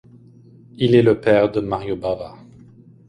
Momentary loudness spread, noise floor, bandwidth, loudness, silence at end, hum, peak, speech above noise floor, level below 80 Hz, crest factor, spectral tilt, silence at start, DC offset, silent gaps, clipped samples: 12 LU; -47 dBFS; 10 kHz; -18 LUFS; 0.75 s; none; -2 dBFS; 29 dB; -50 dBFS; 18 dB; -8 dB/octave; 0.8 s; under 0.1%; none; under 0.1%